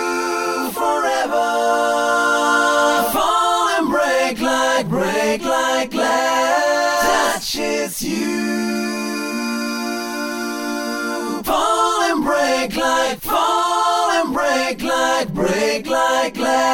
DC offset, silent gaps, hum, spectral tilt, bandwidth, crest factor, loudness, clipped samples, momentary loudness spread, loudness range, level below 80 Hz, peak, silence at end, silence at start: under 0.1%; none; none; -3 dB/octave; 17.5 kHz; 14 dB; -18 LUFS; under 0.1%; 7 LU; 5 LU; -48 dBFS; -4 dBFS; 0 s; 0 s